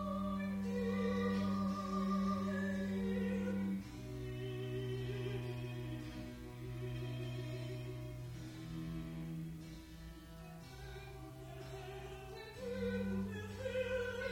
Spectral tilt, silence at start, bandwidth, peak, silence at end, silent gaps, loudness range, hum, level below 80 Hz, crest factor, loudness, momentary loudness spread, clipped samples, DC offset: -7 dB/octave; 0 s; 16.5 kHz; -26 dBFS; 0 s; none; 11 LU; none; -58 dBFS; 14 dB; -42 LUFS; 14 LU; under 0.1%; under 0.1%